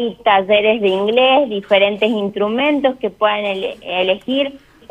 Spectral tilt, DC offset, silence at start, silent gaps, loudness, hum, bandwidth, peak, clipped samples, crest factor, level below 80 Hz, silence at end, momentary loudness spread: -6 dB/octave; under 0.1%; 0 s; none; -16 LUFS; none; 8.8 kHz; -2 dBFS; under 0.1%; 14 dB; -56 dBFS; 0.35 s; 7 LU